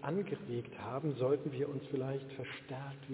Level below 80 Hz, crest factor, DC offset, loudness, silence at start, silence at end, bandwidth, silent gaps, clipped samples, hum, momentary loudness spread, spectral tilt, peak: -72 dBFS; 16 dB; under 0.1%; -39 LUFS; 0 s; 0 s; 4 kHz; none; under 0.1%; none; 10 LU; -6.5 dB/octave; -22 dBFS